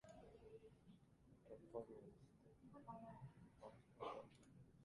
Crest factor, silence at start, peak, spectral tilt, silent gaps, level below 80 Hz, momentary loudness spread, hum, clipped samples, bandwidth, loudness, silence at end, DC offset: 22 dB; 0.05 s; -38 dBFS; -7 dB/octave; none; -80 dBFS; 13 LU; none; under 0.1%; 11 kHz; -60 LUFS; 0 s; under 0.1%